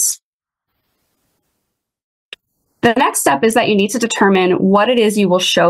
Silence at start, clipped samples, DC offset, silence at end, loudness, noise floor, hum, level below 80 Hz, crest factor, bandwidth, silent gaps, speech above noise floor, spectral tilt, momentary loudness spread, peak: 0 s; under 0.1%; under 0.1%; 0 s; -13 LUFS; -83 dBFS; none; -58 dBFS; 14 dB; 16 kHz; 0.23-0.40 s, 2.04-2.32 s; 71 dB; -3.5 dB/octave; 4 LU; 0 dBFS